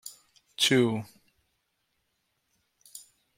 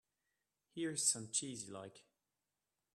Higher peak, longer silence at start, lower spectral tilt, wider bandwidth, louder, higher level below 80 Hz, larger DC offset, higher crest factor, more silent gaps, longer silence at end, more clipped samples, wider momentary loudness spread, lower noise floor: first, -10 dBFS vs -20 dBFS; second, 0.05 s vs 0.75 s; first, -4 dB/octave vs -2 dB/octave; first, 16.5 kHz vs 14 kHz; first, -25 LUFS vs -38 LUFS; first, -74 dBFS vs -88 dBFS; neither; about the same, 22 dB vs 26 dB; neither; second, 0.4 s vs 0.95 s; neither; first, 25 LU vs 19 LU; second, -77 dBFS vs under -90 dBFS